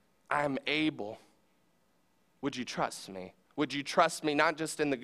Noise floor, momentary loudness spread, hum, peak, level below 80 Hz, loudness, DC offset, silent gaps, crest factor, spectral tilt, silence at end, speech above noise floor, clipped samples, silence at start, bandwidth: -73 dBFS; 15 LU; none; -10 dBFS; -72 dBFS; -32 LUFS; under 0.1%; none; 24 dB; -4 dB/octave; 0 s; 40 dB; under 0.1%; 0.3 s; 14.5 kHz